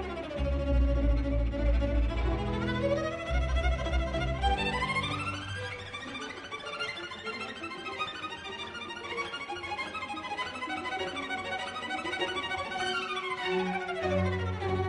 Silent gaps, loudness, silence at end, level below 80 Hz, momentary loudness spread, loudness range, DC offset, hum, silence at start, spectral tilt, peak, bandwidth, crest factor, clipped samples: none; -32 LUFS; 0 s; -36 dBFS; 9 LU; 6 LU; under 0.1%; none; 0 s; -5.5 dB/octave; -16 dBFS; 10.5 kHz; 16 dB; under 0.1%